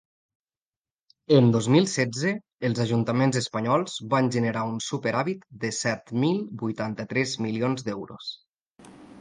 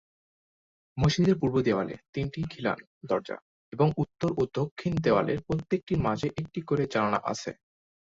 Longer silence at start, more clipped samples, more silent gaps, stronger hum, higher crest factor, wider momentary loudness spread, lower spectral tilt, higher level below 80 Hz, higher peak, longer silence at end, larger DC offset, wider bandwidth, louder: first, 1.3 s vs 0.95 s; neither; second, 2.52-2.58 s, 8.47-8.54 s, 8.61-8.65 s, 8.71-8.75 s vs 2.09-2.13 s, 2.87-3.01 s, 3.42-3.72 s, 4.71-4.76 s, 5.83-5.87 s; neither; about the same, 20 dB vs 18 dB; about the same, 11 LU vs 11 LU; second, -5.5 dB/octave vs -7 dB/octave; second, -64 dBFS vs -52 dBFS; first, -6 dBFS vs -10 dBFS; second, 0 s vs 0.6 s; neither; first, 10 kHz vs 7.8 kHz; first, -25 LUFS vs -29 LUFS